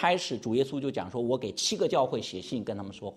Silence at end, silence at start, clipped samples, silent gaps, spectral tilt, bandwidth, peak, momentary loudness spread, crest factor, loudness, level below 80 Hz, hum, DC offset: 0 s; 0 s; under 0.1%; none; -4 dB/octave; 14 kHz; -10 dBFS; 8 LU; 20 dB; -30 LUFS; -68 dBFS; none; under 0.1%